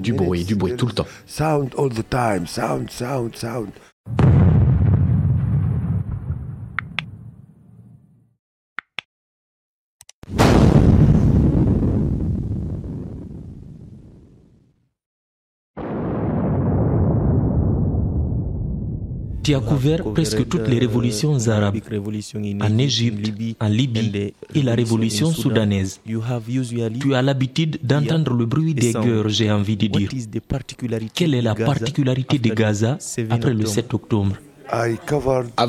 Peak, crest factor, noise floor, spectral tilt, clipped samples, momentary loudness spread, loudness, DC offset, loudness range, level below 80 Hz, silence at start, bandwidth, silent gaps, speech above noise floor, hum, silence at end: -2 dBFS; 18 dB; -59 dBFS; -6.5 dB/octave; under 0.1%; 13 LU; -20 LUFS; under 0.1%; 11 LU; -32 dBFS; 0 s; 14 kHz; 3.92-4.04 s, 8.39-8.76 s, 9.05-9.99 s, 10.14-10.22 s, 15.06-15.74 s; 40 dB; none; 0 s